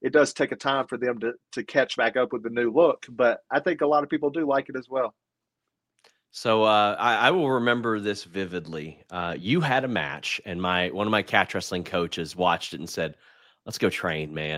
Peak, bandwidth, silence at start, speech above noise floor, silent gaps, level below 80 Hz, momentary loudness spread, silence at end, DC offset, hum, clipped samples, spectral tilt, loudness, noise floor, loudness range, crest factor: -4 dBFS; 16 kHz; 0 s; 59 dB; none; -62 dBFS; 11 LU; 0 s; under 0.1%; none; under 0.1%; -5 dB/octave; -25 LUFS; -84 dBFS; 3 LU; 22 dB